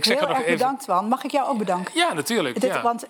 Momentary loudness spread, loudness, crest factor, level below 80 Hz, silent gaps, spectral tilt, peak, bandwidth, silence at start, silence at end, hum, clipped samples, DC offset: 3 LU; -22 LUFS; 18 dB; -82 dBFS; none; -3.5 dB/octave; -6 dBFS; 19.5 kHz; 0 s; 0 s; none; under 0.1%; under 0.1%